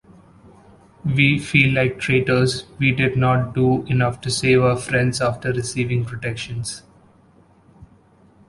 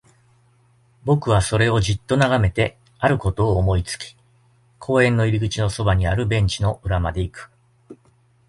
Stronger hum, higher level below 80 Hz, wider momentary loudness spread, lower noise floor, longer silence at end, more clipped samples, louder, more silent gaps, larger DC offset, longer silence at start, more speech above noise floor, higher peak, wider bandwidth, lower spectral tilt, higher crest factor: neither; second, -46 dBFS vs -34 dBFS; about the same, 11 LU vs 12 LU; second, -53 dBFS vs -58 dBFS; about the same, 0.65 s vs 0.55 s; neither; about the same, -19 LUFS vs -20 LUFS; neither; neither; about the same, 1.05 s vs 1.05 s; second, 34 dB vs 39 dB; about the same, -2 dBFS vs -4 dBFS; about the same, 11.5 kHz vs 11.5 kHz; about the same, -5.5 dB/octave vs -6 dB/octave; about the same, 20 dB vs 18 dB